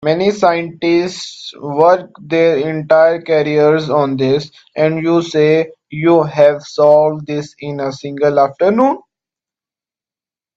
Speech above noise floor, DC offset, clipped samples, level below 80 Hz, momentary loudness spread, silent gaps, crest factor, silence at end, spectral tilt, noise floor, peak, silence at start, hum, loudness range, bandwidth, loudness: over 77 dB; under 0.1%; under 0.1%; -58 dBFS; 11 LU; none; 14 dB; 1.55 s; -6.5 dB/octave; under -90 dBFS; 0 dBFS; 0 s; none; 2 LU; 8 kHz; -14 LUFS